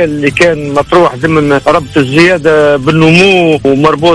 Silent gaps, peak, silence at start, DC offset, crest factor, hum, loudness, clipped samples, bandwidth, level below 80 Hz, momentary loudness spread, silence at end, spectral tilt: none; 0 dBFS; 0 s; 0.5%; 8 dB; none; -7 LUFS; 3%; 11 kHz; -34 dBFS; 5 LU; 0 s; -6 dB/octave